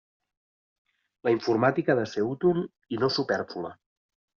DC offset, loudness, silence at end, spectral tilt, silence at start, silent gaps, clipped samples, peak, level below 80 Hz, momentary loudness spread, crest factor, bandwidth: under 0.1%; -27 LUFS; 0.65 s; -4.5 dB/octave; 1.25 s; none; under 0.1%; -8 dBFS; -68 dBFS; 11 LU; 20 dB; 7 kHz